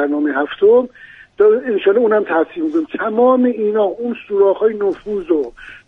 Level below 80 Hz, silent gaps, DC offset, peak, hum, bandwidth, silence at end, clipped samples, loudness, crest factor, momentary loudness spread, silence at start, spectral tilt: -54 dBFS; none; under 0.1%; -2 dBFS; none; 3.8 kHz; 0.1 s; under 0.1%; -15 LUFS; 14 dB; 8 LU; 0 s; -7.5 dB/octave